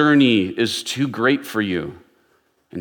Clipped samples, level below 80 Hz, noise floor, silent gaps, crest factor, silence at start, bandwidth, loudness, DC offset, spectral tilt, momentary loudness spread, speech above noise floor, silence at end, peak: under 0.1%; -64 dBFS; -62 dBFS; none; 16 dB; 0 s; 18.5 kHz; -19 LUFS; under 0.1%; -5 dB/octave; 13 LU; 44 dB; 0 s; -4 dBFS